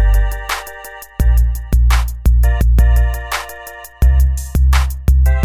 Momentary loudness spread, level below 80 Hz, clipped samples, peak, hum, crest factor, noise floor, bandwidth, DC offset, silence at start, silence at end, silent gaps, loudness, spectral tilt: 16 LU; -12 dBFS; under 0.1%; -2 dBFS; none; 10 dB; -33 dBFS; 15 kHz; 0.4%; 0 s; 0 s; none; -15 LUFS; -5.5 dB/octave